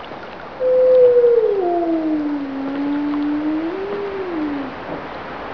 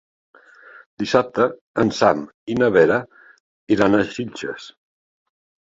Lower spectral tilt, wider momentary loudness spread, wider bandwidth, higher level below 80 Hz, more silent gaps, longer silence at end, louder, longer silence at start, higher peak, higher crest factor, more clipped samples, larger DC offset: first, -8 dB/octave vs -6 dB/octave; first, 17 LU vs 13 LU; second, 5.4 kHz vs 7.8 kHz; about the same, -52 dBFS vs -56 dBFS; second, none vs 1.61-1.74 s, 2.34-2.46 s, 3.40-3.67 s; second, 0 s vs 0.95 s; about the same, -18 LUFS vs -19 LUFS; second, 0 s vs 1 s; about the same, -4 dBFS vs -2 dBFS; second, 14 dB vs 20 dB; neither; first, 0.5% vs under 0.1%